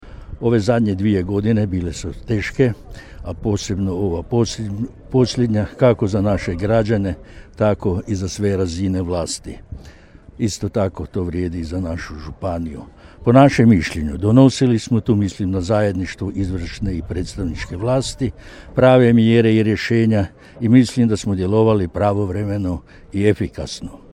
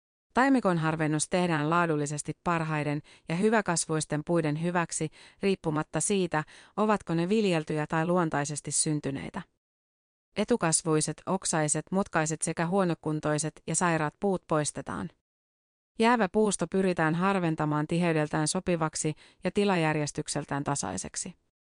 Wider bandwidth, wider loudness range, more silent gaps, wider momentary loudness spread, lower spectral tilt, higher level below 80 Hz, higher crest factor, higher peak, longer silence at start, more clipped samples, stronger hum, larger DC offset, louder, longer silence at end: about the same, 11.5 kHz vs 10.5 kHz; first, 8 LU vs 2 LU; second, none vs 9.57-10.32 s, 15.21-15.95 s; first, 14 LU vs 8 LU; first, -7 dB/octave vs -4.5 dB/octave; first, -38 dBFS vs -60 dBFS; about the same, 18 dB vs 18 dB; first, 0 dBFS vs -12 dBFS; second, 0 s vs 0.35 s; neither; neither; neither; first, -18 LUFS vs -28 LUFS; second, 0.15 s vs 0.3 s